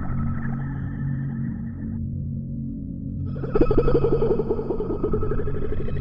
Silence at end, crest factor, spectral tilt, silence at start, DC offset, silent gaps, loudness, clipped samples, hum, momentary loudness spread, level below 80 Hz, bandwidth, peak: 0 s; 18 dB; -11.5 dB/octave; 0 s; under 0.1%; none; -26 LUFS; under 0.1%; none; 10 LU; -30 dBFS; 5.2 kHz; -6 dBFS